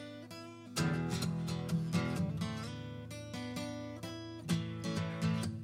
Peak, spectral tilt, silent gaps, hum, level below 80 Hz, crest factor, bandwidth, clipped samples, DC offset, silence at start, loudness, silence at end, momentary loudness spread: -22 dBFS; -5.5 dB/octave; none; none; -60 dBFS; 16 dB; 16 kHz; under 0.1%; under 0.1%; 0 s; -38 LUFS; 0 s; 11 LU